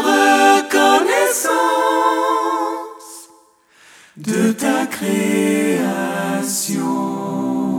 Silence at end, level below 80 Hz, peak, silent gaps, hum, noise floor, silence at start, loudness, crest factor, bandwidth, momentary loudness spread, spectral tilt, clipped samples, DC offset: 0 s; -70 dBFS; -2 dBFS; none; none; -51 dBFS; 0 s; -16 LUFS; 16 dB; 19 kHz; 10 LU; -3.5 dB/octave; under 0.1%; under 0.1%